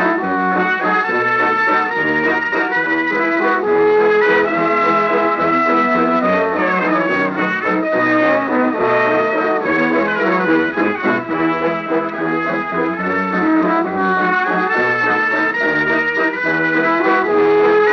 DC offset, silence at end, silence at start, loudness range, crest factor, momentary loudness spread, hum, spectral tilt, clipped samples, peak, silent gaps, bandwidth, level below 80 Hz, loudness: under 0.1%; 0 s; 0 s; 3 LU; 12 dB; 4 LU; none; -7 dB/octave; under 0.1%; -4 dBFS; none; 6.6 kHz; -56 dBFS; -15 LUFS